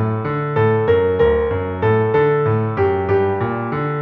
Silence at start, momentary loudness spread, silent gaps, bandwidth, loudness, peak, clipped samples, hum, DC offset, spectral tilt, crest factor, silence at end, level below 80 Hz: 0 s; 6 LU; none; 4.7 kHz; -17 LUFS; -4 dBFS; under 0.1%; none; under 0.1%; -10 dB/octave; 12 dB; 0 s; -38 dBFS